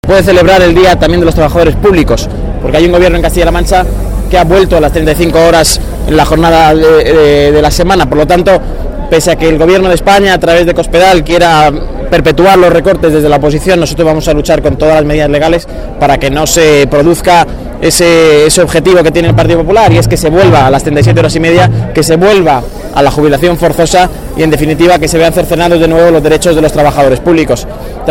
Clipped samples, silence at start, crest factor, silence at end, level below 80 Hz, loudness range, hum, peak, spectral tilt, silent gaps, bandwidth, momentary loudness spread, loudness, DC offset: 2%; 0.05 s; 6 dB; 0 s; -18 dBFS; 2 LU; none; 0 dBFS; -5 dB/octave; none; 17 kHz; 6 LU; -6 LUFS; under 0.1%